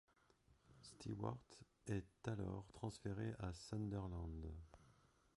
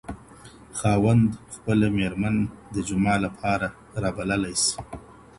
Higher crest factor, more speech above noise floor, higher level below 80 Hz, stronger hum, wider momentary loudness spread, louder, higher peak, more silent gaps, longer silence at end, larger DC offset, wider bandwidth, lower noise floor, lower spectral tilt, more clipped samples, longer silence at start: about the same, 20 dB vs 16 dB; about the same, 27 dB vs 24 dB; second, -62 dBFS vs -46 dBFS; neither; about the same, 15 LU vs 15 LU; second, -50 LUFS vs -24 LUFS; second, -30 dBFS vs -8 dBFS; neither; first, 0.45 s vs 0.25 s; neither; about the same, 11.5 kHz vs 11.5 kHz; first, -76 dBFS vs -47 dBFS; first, -7 dB/octave vs -5 dB/octave; neither; first, 0.5 s vs 0.1 s